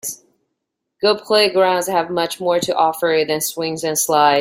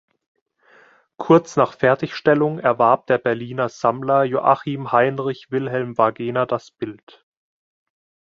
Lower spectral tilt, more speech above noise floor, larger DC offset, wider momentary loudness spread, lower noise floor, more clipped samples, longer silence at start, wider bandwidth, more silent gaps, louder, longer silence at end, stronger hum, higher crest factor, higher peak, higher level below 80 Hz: second, -2.5 dB/octave vs -7 dB/octave; first, 60 dB vs 34 dB; neither; about the same, 7 LU vs 9 LU; first, -77 dBFS vs -53 dBFS; neither; second, 0.05 s vs 1.2 s; first, 16.5 kHz vs 7.6 kHz; neither; about the same, -17 LUFS vs -19 LUFS; second, 0 s vs 1.35 s; neither; about the same, 16 dB vs 18 dB; about the same, -2 dBFS vs -2 dBFS; about the same, -64 dBFS vs -62 dBFS